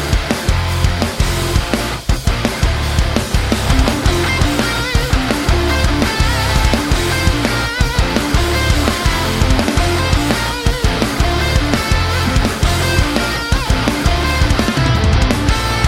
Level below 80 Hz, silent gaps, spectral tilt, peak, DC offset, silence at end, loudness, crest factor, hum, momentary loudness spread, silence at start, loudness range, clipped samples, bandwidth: -18 dBFS; none; -4.5 dB/octave; 0 dBFS; under 0.1%; 0 s; -15 LUFS; 14 dB; none; 3 LU; 0 s; 1 LU; under 0.1%; 16.5 kHz